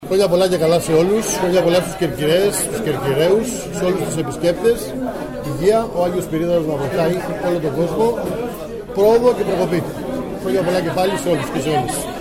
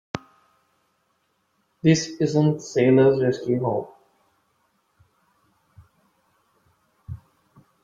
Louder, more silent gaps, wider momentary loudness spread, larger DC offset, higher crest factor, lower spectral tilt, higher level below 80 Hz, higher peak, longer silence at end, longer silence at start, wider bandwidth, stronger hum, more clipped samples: first, -18 LUFS vs -21 LUFS; neither; second, 9 LU vs 24 LU; neither; second, 14 dB vs 22 dB; second, -5 dB/octave vs -6.5 dB/octave; first, -40 dBFS vs -60 dBFS; about the same, -2 dBFS vs -4 dBFS; second, 0 s vs 0.7 s; second, 0 s vs 0.15 s; first, 16.5 kHz vs 7.8 kHz; neither; neither